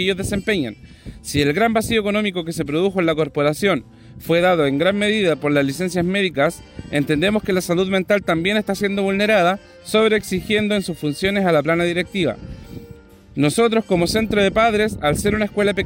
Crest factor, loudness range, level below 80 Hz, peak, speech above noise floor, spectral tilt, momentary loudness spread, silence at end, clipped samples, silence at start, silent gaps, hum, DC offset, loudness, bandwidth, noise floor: 16 dB; 2 LU; -44 dBFS; -4 dBFS; 24 dB; -5 dB/octave; 8 LU; 0 s; under 0.1%; 0 s; none; none; under 0.1%; -19 LUFS; 16.5 kHz; -42 dBFS